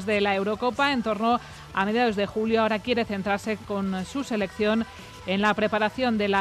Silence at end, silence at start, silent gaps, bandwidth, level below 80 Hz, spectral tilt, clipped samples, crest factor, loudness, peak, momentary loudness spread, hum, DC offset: 0 s; 0 s; none; 13.5 kHz; -54 dBFS; -5.5 dB/octave; under 0.1%; 14 dB; -25 LUFS; -10 dBFS; 6 LU; none; under 0.1%